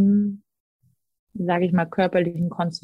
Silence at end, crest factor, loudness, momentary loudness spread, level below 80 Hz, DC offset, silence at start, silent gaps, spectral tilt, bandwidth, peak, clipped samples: 0.05 s; 16 dB; -23 LUFS; 11 LU; -62 dBFS; under 0.1%; 0 s; 0.60-0.79 s, 1.19-1.27 s; -8 dB/octave; 8.2 kHz; -8 dBFS; under 0.1%